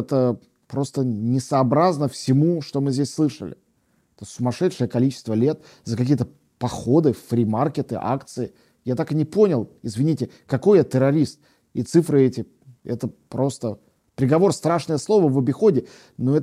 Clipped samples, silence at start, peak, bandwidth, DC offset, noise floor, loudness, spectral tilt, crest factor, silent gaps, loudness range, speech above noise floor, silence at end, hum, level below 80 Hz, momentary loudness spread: under 0.1%; 0 s; -4 dBFS; 14.5 kHz; under 0.1%; -65 dBFS; -22 LUFS; -7.5 dB/octave; 16 dB; none; 3 LU; 44 dB; 0 s; none; -60 dBFS; 13 LU